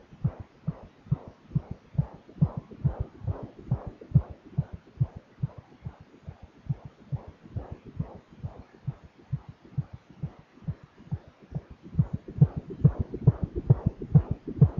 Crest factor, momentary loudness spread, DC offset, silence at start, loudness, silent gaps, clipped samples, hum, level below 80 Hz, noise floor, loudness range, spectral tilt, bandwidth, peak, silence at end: 22 dB; 18 LU; under 0.1%; 0.2 s; -31 LUFS; none; under 0.1%; none; -44 dBFS; -47 dBFS; 12 LU; -11.5 dB/octave; 3.5 kHz; -8 dBFS; 0 s